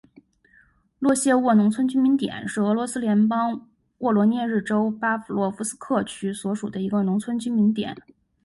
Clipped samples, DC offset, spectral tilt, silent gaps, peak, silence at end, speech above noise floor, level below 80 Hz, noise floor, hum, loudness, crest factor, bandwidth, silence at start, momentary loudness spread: under 0.1%; under 0.1%; -5.5 dB/octave; none; -8 dBFS; 0.45 s; 37 dB; -64 dBFS; -59 dBFS; none; -23 LUFS; 14 dB; 11.5 kHz; 1 s; 9 LU